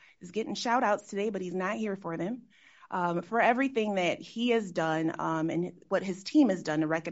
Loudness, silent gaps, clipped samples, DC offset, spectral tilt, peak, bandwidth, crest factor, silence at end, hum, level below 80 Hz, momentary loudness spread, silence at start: -30 LUFS; none; under 0.1%; under 0.1%; -4.5 dB/octave; -10 dBFS; 8 kHz; 20 dB; 0 s; none; -76 dBFS; 9 LU; 0.2 s